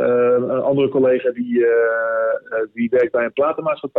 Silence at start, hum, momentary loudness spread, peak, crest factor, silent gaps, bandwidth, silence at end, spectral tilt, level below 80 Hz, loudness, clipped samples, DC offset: 0 s; none; 6 LU; -6 dBFS; 12 dB; none; 4.1 kHz; 0 s; -9.5 dB/octave; -62 dBFS; -18 LUFS; under 0.1%; under 0.1%